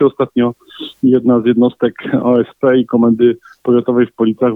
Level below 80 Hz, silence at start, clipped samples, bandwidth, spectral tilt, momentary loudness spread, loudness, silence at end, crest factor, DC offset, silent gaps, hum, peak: -56 dBFS; 0 s; under 0.1%; 4 kHz; -9.5 dB/octave; 7 LU; -13 LUFS; 0 s; 12 dB; under 0.1%; none; none; -2 dBFS